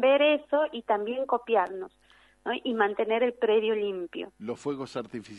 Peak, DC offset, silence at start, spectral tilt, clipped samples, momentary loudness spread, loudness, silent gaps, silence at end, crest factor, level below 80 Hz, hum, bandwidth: -12 dBFS; under 0.1%; 0 s; -5 dB/octave; under 0.1%; 13 LU; -28 LUFS; none; 0 s; 16 dB; -70 dBFS; none; 10.5 kHz